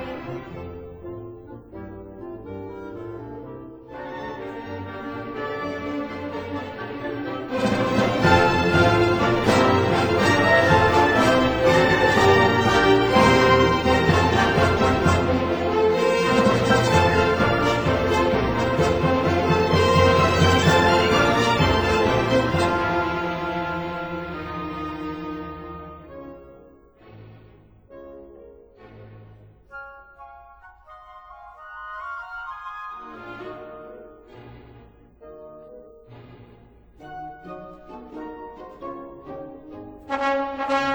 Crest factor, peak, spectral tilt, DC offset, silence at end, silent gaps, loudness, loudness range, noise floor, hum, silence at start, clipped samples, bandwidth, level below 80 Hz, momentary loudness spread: 20 dB; -2 dBFS; -5.5 dB/octave; under 0.1%; 0 s; none; -20 LUFS; 21 LU; -50 dBFS; none; 0 s; under 0.1%; over 20 kHz; -42 dBFS; 22 LU